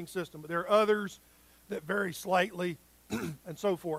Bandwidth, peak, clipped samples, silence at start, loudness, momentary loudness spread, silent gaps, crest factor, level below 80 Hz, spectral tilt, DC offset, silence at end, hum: 16 kHz; -12 dBFS; under 0.1%; 0 s; -32 LUFS; 15 LU; none; 20 dB; -68 dBFS; -5 dB/octave; under 0.1%; 0 s; none